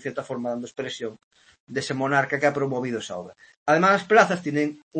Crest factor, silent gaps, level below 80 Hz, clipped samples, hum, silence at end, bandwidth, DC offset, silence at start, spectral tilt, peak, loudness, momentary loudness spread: 22 dB; 1.23-1.31 s, 1.60-1.67 s, 3.57-3.66 s, 4.83-4.91 s; -70 dBFS; under 0.1%; none; 0 s; 8.8 kHz; under 0.1%; 0 s; -5 dB/octave; -4 dBFS; -23 LUFS; 15 LU